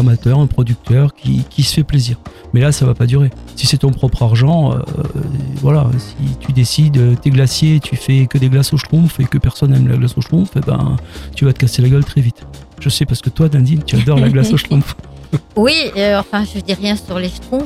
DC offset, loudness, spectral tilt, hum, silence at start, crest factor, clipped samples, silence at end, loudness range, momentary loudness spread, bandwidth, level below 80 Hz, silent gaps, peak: under 0.1%; -14 LUFS; -6.5 dB/octave; none; 0 s; 12 dB; under 0.1%; 0 s; 2 LU; 9 LU; 14 kHz; -32 dBFS; none; 0 dBFS